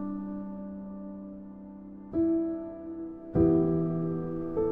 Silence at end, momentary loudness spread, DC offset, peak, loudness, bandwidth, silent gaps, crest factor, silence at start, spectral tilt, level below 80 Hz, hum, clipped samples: 0 s; 19 LU; under 0.1%; -12 dBFS; -30 LUFS; 2.5 kHz; none; 18 dB; 0 s; -13 dB/octave; -50 dBFS; none; under 0.1%